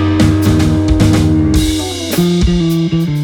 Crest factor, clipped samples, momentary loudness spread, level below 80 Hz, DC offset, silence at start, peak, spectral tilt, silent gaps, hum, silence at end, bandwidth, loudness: 10 dB; under 0.1%; 4 LU; -22 dBFS; under 0.1%; 0 s; 0 dBFS; -6 dB/octave; none; none; 0 s; 18.5 kHz; -12 LUFS